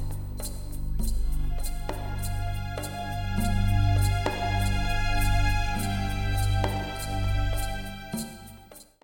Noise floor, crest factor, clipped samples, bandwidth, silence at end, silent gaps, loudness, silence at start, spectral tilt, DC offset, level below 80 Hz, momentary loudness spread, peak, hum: -49 dBFS; 14 dB; under 0.1%; 18 kHz; 0.2 s; none; -29 LUFS; 0 s; -5 dB/octave; under 0.1%; -30 dBFS; 11 LU; -12 dBFS; 50 Hz at -40 dBFS